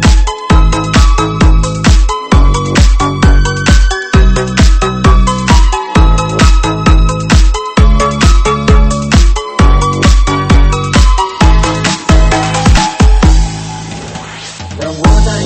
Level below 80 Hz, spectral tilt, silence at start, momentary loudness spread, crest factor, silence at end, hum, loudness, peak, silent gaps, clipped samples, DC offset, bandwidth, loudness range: -10 dBFS; -5 dB/octave; 0 s; 4 LU; 8 dB; 0 s; none; -9 LUFS; 0 dBFS; none; 2%; under 0.1%; 8.8 kHz; 1 LU